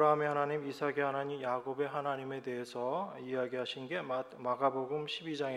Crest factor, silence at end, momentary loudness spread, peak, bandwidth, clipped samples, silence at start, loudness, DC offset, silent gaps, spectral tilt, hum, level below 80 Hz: 20 dB; 0 s; 6 LU; -16 dBFS; 13 kHz; under 0.1%; 0 s; -36 LUFS; under 0.1%; none; -6 dB/octave; none; -84 dBFS